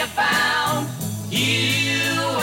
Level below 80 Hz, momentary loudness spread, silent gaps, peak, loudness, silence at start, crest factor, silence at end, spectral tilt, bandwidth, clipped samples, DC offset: -56 dBFS; 7 LU; none; -8 dBFS; -20 LUFS; 0 s; 12 dB; 0 s; -3 dB/octave; 17 kHz; under 0.1%; under 0.1%